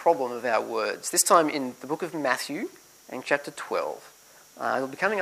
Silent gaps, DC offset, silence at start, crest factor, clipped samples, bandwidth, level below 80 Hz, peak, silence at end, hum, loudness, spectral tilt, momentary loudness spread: none; under 0.1%; 0 s; 22 dB; under 0.1%; 15.5 kHz; -78 dBFS; -4 dBFS; 0 s; none; -26 LUFS; -2 dB/octave; 15 LU